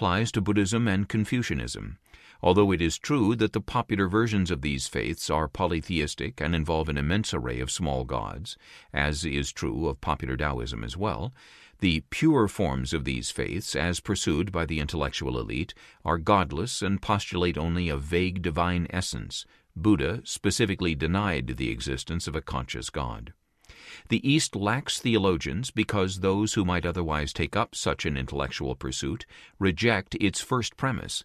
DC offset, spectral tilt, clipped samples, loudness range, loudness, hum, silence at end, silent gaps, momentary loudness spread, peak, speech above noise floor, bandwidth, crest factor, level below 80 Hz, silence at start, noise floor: under 0.1%; -5 dB/octave; under 0.1%; 4 LU; -27 LUFS; none; 0 s; none; 9 LU; -8 dBFS; 24 dB; 14 kHz; 20 dB; -40 dBFS; 0 s; -52 dBFS